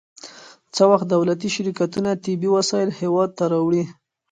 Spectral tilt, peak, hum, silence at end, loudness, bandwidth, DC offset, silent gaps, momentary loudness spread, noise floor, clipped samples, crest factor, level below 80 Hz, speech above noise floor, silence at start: -5.5 dB/octave; -2 dBFS; none; 0.4 s; -20 LUFS; 9.4 kHz; under 0.1%; none; 14 LU; -43 dBFS; under 0.1%; 18 dB; -64 dBFS; 24 dB; 0.25 s